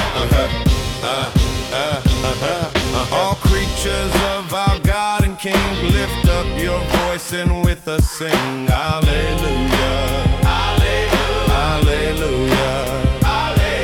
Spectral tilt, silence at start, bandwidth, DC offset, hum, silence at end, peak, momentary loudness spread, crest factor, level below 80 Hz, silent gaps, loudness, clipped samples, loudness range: -5 dB/octave; 0 s; 18 kHz; under 0.1%; none; 0 s; -2 dBFS; 3 LU; 14 dB; -22 dBFS; none; -17 LUFS; under 0.1%; 1 LU